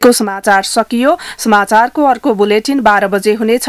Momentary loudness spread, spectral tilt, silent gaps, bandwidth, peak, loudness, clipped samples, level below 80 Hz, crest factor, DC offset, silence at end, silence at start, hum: 3 LU; -3.5 dB/octave; none; 16 kHz; 0 dBFS; -11 LUFS; 0.5%; -50 dBFS; 10 dB; under 0.1%; 0 s; 0 s; none